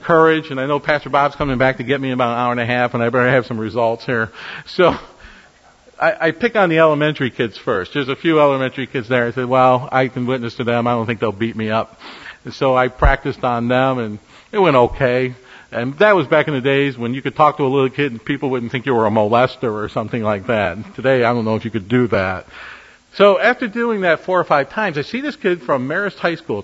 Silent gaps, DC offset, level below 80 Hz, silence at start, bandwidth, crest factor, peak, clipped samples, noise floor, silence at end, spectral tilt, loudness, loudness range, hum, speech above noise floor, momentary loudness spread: none; under 0.1%; -36 dBFS; 0 s; 8 kHz; 18 dB; 0 dBFS; under 0.1%; -49 dBFS; 0 s; -7 dB/octave; -17 LUFS; 2 LU; none; 32 dB; 9 LU